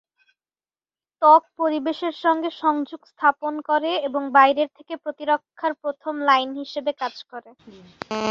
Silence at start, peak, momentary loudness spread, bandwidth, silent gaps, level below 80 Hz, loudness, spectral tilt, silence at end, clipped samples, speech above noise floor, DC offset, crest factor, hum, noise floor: 1.2 s; -2 dBFS; 15 LU; 7.4 kHz; none; -72 dBFS; -21 LUFS; -4 dB/octave; 0 s; under 0.1%; over 68 dB; under 0.1%; 20 dB; none; under -90 dBFS